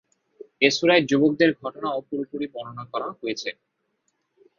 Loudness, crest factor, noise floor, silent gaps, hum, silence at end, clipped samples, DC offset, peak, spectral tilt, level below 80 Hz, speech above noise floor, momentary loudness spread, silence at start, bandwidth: -23 LUFS; 22 dB; -74 dBFS; none; none; 1.05 s; under 0.1%; under 0.1%; -4 dBFS; -4.5 dB/octave; -68 dBFS; 50 dB; 14 LU; 0.6 s; 7.4 kHz